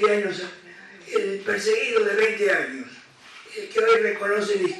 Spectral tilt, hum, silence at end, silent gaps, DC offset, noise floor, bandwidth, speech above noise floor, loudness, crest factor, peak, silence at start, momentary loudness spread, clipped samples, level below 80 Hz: -3.5 dB/octave; none; 0 s; none; under 0.1%; -47 dBFS; 12 kHz; 24 dB; -22 LUFS; 18 dB; -4 dBFS; 0 s; 18 LU; under 0.1%; -72 dBFS